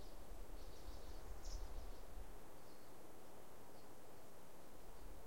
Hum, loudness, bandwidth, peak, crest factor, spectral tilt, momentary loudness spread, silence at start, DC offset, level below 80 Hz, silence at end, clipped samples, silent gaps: none; -59 LUFS; 16.5 kHz; -36 dBFS; 18 dB; -4.5 dB/octave; 7 LU; 0 s; 0.4%; -56 dBFS; 0 s; under 0.1%; none